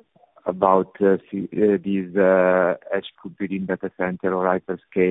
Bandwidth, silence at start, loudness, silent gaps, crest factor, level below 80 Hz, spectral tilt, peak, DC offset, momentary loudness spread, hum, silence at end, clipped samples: 4 kHz; 0.45 s; -22 LUFS; none; 18 dB; -60 dBFS; -10 dB/octave; -2 dBFS; under 0.1%; 11 LU; none; 0 s; under 0.1%